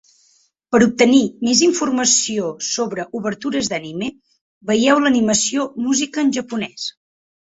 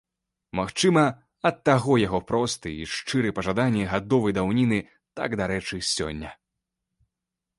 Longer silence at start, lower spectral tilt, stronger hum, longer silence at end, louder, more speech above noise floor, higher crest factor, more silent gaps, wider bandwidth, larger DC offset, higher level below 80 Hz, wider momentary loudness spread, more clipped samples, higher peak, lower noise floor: first, 0.7 s vs 0.55 s; second, -3 dB/octave vs -5 dB/octave; neither; second, 0.55 s vs 1.25 s; first, -17 LUFS vs -25 LUFS; second, 41 dB vs 62 dB; about the same, 18 dB vs 20 dB; first, 4.41-4.61 s vs none; second, 8 kHz vs 11.5 kHz; neither; second, -58 dBFS vs -50 dBFS; about the same, 12 LU vs 11 LU; neither; first, 0 dBFS vs -6 dBFS; second, -59 dBFS vs -86 dBFS